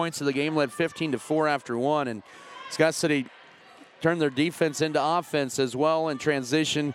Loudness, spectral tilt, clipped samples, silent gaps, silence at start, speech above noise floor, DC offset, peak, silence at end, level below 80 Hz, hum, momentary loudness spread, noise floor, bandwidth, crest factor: -26 LUFS; -4.5 dB/octave; under 0.1%; none; 0 s; 26 dB; under 0.1%; -6 dBFS; 0 s; -72 dBFS; none; 6 LU; -51 dBFS; 16 kHz; 20 dB